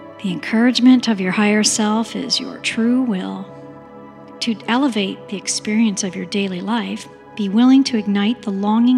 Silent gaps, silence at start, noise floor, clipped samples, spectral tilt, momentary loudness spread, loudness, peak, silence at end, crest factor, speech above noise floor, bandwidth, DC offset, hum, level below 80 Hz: none; 0 s; -38 dBFS; under 0.1%; -4 dB/octave; 13 LU; -18 LUFS; -2 dBFS; 0 s; 16 dB; 21 dB; 12 kHz; under 0.1%; none; -64 dBFS